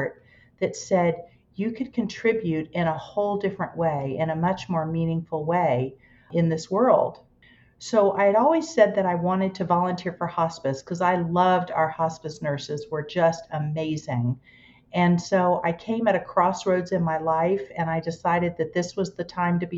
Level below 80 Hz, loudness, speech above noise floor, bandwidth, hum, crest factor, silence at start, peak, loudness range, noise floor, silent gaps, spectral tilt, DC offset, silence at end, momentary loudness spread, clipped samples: -58 dBFS; -24 LUFS; 33 dB; 7.8 kHz; none; 18 dB; 0 s; -6 dBFS; 4 LU; -56 dBFS; none; -6.5 dB/octave; under 0.1%; 0 s; 10 LU; under 0.1%